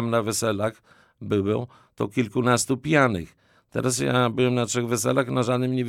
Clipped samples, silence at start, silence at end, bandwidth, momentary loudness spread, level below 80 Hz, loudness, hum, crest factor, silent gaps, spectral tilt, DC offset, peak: under 0.1%; 0 s; 0 s; 16.5 kHz; 11 LU; -58 dBFS; -24 LUFS; none; 18 dB; none; -5 dB/octave; under 0.1%; -6 dBFS